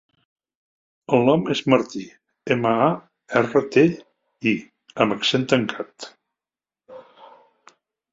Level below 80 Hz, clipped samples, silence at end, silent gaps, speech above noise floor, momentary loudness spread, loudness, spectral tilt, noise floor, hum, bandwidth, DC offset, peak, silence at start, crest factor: -64 dBFS; under 0.1%; 1.15 s; none; over 70 dB; 19 LU; -21 LUFS; -6 dB/octave; under -90 dBFS; none; 7.8 kHz; under 0.1%; 0 dBFS; 1.1 s; 22 dB